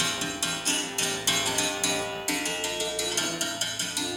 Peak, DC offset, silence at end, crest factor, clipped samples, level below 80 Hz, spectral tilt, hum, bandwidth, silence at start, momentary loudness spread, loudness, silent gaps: -12 dBFS; under 0.1%; 0 s; 16 dB; under 0.1%; -58 dBFS; -1 dB/octave; none; 19 kHz; 0 s; 4 LU; -26 LUFS; none